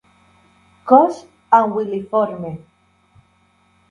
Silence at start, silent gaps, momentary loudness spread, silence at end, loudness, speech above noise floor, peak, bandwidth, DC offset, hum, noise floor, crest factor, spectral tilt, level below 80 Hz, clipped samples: 0.85 s; none; 22 LU; 1.35 s; -16 LUFS; 42 dB; 0 dBFS; 10.5 kHz; under 0.1%; none; -58 dBFS; 20 dB; -8 dB/octave; -62 dBFS; under 0.1%